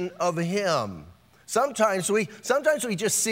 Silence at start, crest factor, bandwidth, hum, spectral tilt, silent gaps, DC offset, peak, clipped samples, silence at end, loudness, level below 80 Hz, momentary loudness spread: 0 s; 18 dB; 16 kHz; none; -3.5 dB/octave; none; under 0.1%; -8 dBFS; under 0.1%; 0 s; -25 LUFS; -64 dBFS; 5 LU